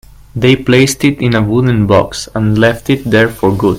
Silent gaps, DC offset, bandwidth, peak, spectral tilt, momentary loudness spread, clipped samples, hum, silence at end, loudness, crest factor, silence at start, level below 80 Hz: none; under 0.1%; 16 kHz; 0 dBFS; -6 dB/octave; 6 LU; 0.1%; none; 0 s; -11 LUFS; 10 dB; 0.35 s; -36 dBFS